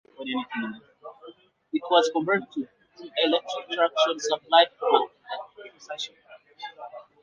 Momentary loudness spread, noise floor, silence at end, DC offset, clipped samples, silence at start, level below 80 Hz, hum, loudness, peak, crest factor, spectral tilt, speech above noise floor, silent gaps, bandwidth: 22 LU; -50 dBFS; 0.2 s; under 0.1%; under 0.1%; 0.2 s; -80 dBFS; none; -25 LUFS; -4 dBFS; 22 dB; -3 dB/octave; 25 dB; none; 9.6 kHz